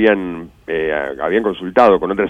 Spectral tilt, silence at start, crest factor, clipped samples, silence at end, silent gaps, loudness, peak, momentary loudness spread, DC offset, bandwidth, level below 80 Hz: -7 dB/octave; 0 s; 16 dB; under 0.1%; 0 s; none; -16 LUFS; 0 dBFS; 13 LU; under 0.1%; 8.2 kHz; -46 dBFS